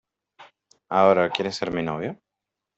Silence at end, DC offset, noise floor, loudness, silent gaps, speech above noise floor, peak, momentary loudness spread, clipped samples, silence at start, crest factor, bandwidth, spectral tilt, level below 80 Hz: 0.65 s; under 0.1%; -85 dBFS; -23 LUFS; none; 63 dB; -4 dBFS; 14 LU; under 0.1%; 0.4 s; 22 dB; 8.2 kHz; -5.5 dB/octave; -62 dBFS